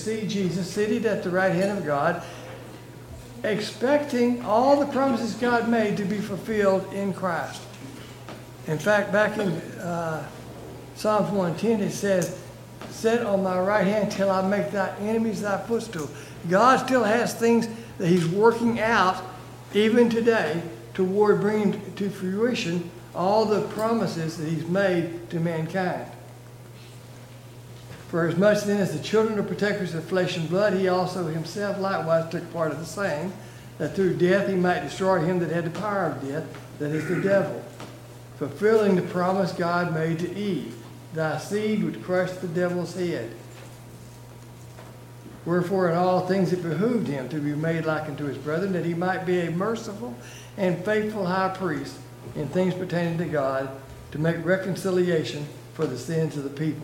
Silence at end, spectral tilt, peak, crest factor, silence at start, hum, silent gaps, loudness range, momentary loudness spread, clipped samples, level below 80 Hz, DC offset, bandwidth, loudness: 0 s; -6 dB/octave; -6 dBFS; 20 dB; 0 s; none; none; 5 LU; 19 LU; under 0.1%; -58 dBFS; under 0.1%; 16.5 kHz; -25 LUFS